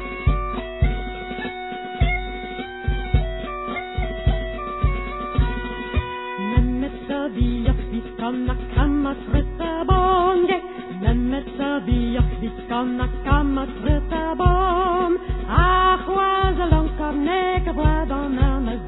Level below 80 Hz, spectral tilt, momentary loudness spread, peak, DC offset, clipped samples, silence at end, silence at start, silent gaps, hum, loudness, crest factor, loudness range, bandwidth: -26 dBFS; -11 dB/octave; 10 LU; -2 dBFS; under 0.1%; under 0.1%; 0 s; 0 s; none; none; -22 LUFS; 20 dB; 6 LU; 4.1 kHz